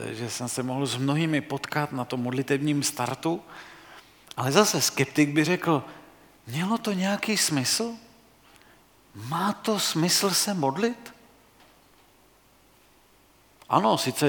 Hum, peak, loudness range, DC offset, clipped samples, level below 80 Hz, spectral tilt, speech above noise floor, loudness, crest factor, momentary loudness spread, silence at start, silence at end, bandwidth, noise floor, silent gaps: none; -4 dBFS; 4 LU; under 0.1%; under 0.1%; -68 dBFS; -4 dB/octave; 33 dB; -25 LUFS; 24 dB; 12 LU; 0 s; 0 s; 19 kHz; -59 dBFS; none